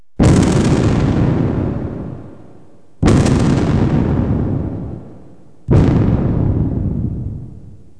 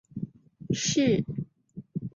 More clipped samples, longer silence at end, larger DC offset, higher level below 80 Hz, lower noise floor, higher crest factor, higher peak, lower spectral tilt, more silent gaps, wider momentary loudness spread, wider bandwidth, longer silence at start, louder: neither; first, 0.3 s vs 0.05 s; first, 1% vs under 0.1%; first, -26 dBFS vs -58 dBFS; about the same, -46 dBFS vs -48 dBFS; about the same, 16 dB vs 18 dB; first, 0 dBFS vs -12 dBFS; first, -7.5 dB/octave vs -4.5 dB/octave; neither; about the same, 16 LU vs 18 LU; first, 11 kHz vs 7.8 kHz; about the same, 0.2 s vs 0.15 s; first, -15 LUFS vs -28 LUFS